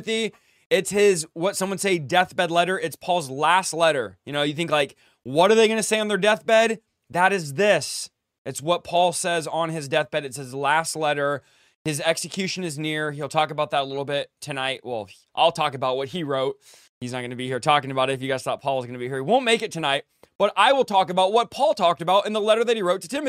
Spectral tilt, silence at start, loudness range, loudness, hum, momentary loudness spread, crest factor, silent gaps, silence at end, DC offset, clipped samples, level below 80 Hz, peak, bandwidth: -3.5 dB/octave; 0 s; 5 LU; -23 LUFS; none; 11 LU; 20 dB; 0.66-0.70 s, 8.38-8.45 s, 11.75-11.85 s, 16.89-17.01 s, 20.35-20.39 s; 0 s; under 0.1%; under 0.1%; -68 dBFS; -2 dBFS; 16 kHz